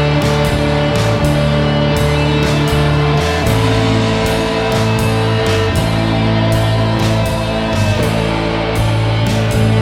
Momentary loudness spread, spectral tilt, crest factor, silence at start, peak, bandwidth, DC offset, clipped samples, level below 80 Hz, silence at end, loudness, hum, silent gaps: 2 LU; -6 dB/octave; 12 dB; 0 s; 0 dBFS; 16.5 kHz; under 0.1%; under 0.1%; -26 dBFS; 0 s; -14 LUFS; none; none